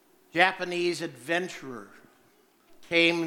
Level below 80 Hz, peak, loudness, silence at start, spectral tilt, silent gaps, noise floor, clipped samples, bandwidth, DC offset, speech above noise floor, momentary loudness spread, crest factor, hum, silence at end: -74 dBFS; -4 dBFS; -27 LUFS; 0.35 s; -4 dB/octave; none; -63 dBFS; under 0.1%; 16 kHz; under 0.1%; 36 dB; 17 LU; 26 dB; none; 0 s